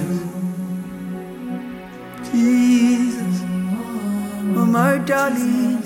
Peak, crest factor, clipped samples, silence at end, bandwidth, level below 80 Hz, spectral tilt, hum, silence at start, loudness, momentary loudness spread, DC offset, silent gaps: -6 dBFS; 14 dB; under 0.1%; 0 s; 16.5 kHz; -56 dBFS; -6.5 dB/octave; none; 0 s; -20 LUFS; 15 LU; under 0.1%; none